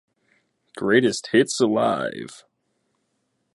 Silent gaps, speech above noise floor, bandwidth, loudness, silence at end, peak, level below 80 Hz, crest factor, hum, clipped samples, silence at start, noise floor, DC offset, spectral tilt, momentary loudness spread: none; 52 dB; 11.5 kHz; -21 LUFS; 1.2 s; -4 dBFS; -68 dBFS; 20 dB; none; under 0.1%; 0.75 s; -73 dBFS; under 0.1%; -4.5 dB/octave; 13 LU